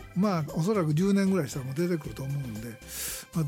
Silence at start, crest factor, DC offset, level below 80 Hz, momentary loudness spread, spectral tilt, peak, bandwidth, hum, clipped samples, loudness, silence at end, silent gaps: 0 s; 14 dB; under 0.1%; -54 dBFS; 10 LU; -6.5 dB/octave; -14 dBFS; 17 kHz; none; under 0.1%; -29 LUFS; 0 s; none